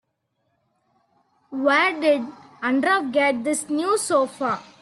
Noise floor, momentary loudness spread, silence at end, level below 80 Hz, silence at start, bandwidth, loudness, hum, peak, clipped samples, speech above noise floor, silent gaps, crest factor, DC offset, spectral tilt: -73 dBFS; 8 LU; 0.2 s; -74 dBFS; 1.5 s; 12.5 kHz; -21 LUFS; none; -6 dBFS; under 0.1%; 52 dB; none; 16 dB; under 0.1%; -2.5 dB/octave